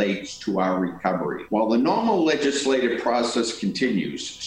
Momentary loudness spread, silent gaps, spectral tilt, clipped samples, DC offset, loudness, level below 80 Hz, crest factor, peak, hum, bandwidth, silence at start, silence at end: 6 LU; none; -4.5 dB/octave; under 0.1%; under 0.1%; -23 LUFS; -60 dBFS; 16 dB; -8 dBFS; none; 11 kHz; 0 s; 0 s